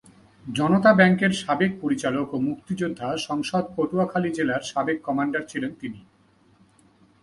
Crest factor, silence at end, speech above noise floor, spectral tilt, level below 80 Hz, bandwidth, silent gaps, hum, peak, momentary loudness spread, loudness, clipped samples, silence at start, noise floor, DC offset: 20 dB; 1.2 s; 36 dB; -6 dB/octave; -62 dBFS; 11.5 kHz; none; none; -4 dBFS; 13 LU; -23 LUFS; under 0.1%; 0.45 s; -59 dBFS; under 0.1%